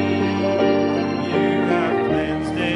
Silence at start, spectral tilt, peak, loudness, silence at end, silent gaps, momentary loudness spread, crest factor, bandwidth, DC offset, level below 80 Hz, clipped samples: 0 s; -7 dB/octave; -6 dBFS; -20 LUFS; 0 s; none; 4 LU; 12 dB; 11 kHz; under 0.1%; -48 dBFS; under 0.1%